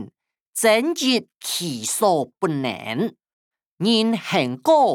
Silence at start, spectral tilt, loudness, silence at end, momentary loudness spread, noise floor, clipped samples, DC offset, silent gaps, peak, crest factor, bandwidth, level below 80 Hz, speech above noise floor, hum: 0 s; -3.5 dB/octave; -21 LUFS; 0 s; 9 LU; -53 dBFS; under 0.1%; under 0.1%; 0.41-0.53 s, 1.36-1.40 s, 3.33-3.51 s, 3.66-3.78 s; -4 dBFS; 16 dB; 19.5 kHz; -72 dBFS; 33 dB; none